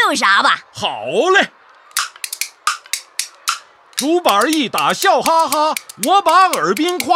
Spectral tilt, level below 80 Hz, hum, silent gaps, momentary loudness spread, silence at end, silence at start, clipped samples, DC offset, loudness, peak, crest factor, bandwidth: -1.5 dB/octave; -68 dBFS; none; none; 11 LU; 0 s; 0 s; under 0.1%; under 0.1%; -16 LUFS; -2 dBFS; 14 dB; 16.5 kHz